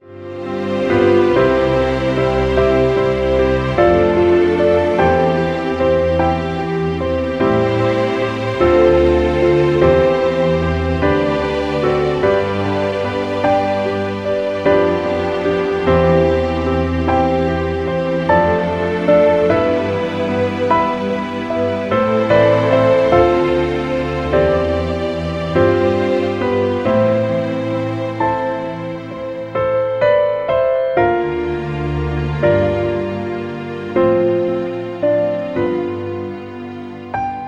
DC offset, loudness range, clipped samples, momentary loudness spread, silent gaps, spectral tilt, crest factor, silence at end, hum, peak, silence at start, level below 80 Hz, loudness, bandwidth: under 0.1%; 4 LU; under 0.1%; 9 LU; none; -7.5 dB/octave; 16 dB; 0 s; none; 0 dBFS; 0.05 s; -34 dBFS; -16 LUFS; 8.8 kHz